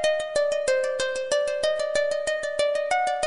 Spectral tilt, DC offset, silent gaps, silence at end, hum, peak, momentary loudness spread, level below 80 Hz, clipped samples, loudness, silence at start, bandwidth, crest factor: -0.5 dB/octave; under 0.1%; none; 0 s; none; -12 dBFS; 3 LU; -58 dBFS; under 0.1%; -25 LUFS; 0 s; 11 kHz; 12 dB